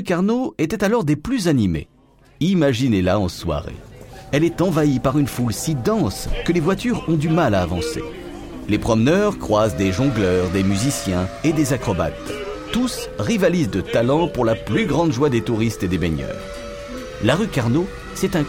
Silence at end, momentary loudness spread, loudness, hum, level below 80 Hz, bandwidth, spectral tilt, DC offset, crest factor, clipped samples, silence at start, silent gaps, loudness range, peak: 0 s; 11 LU; -20 LUFS; none; -38 dBFS; 17 kHz; -6 dB/octave; under 0.1%; 18 dB; under 0.1%; 0 s; none; 2 LU; -2 dBFS